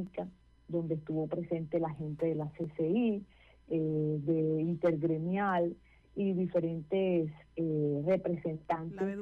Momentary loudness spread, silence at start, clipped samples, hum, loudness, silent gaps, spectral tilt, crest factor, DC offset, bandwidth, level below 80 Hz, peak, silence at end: 8 LU; 0 s; under 0.1%; none; -34 LUFS; none; -10 dB/octave; 12 dB; under 0.1%; 4.8 kHz; -64 dBFS; -20 dBFS; 0 s